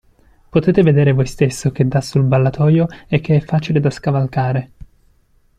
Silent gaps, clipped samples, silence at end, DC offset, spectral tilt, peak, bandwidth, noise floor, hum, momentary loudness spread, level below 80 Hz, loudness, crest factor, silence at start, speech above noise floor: none; under 0.1%; 0.95 s; under 0.1%; -7.5 dB/octave; -2 dBFS; 11.5 kHz; -55 dBFS; none; 6 LU; -42 dBFS; -16 LUFS; 14 dB; 0.55 s; 40 dB